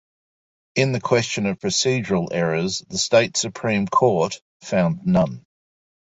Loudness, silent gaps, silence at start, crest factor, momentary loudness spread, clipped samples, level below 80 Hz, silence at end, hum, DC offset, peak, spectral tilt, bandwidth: -21 LUFS; 4.41-4.60 s; 0.75 s; 18 dB; 7 LU; under 0.1%; -54 dBFS; 0.75 s; none; under 0.1%; -2 dBFS; -4.5 dB/octave; 8 kHz